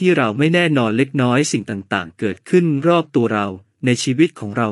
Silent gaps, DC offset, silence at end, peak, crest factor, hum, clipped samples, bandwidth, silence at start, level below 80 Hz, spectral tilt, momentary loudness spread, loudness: none; under 0.1%; 0 s; 0 dBFS; 16 dB; none; under 0.1%; 11.5 kHz; 0 s; -66 dBFS; -5.5 dB/octave; 8 LU; -18 LUFS